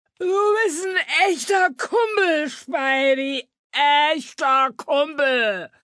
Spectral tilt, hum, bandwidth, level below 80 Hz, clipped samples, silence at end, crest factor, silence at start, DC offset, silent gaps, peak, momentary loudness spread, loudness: -1.5 dB/octave; none; 11 kHz; -84 dBFS; under 0.1%; 0.15 s; 14 dB; 0.2 s; under 0.1%; 3.59-3.70 s; -6 dBFS; 6 LU; -20 LUFS